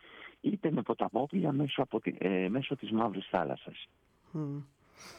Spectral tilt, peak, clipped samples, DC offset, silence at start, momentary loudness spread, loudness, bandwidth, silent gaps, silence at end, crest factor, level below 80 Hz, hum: -7.5 dB/octave; -16 dBFS; under 0.1%; under 0.1%; 0.05 s; 15 LU; -34 LUFS; 11 kHz; none; 0 s; 20 dB; -70 dBFS; none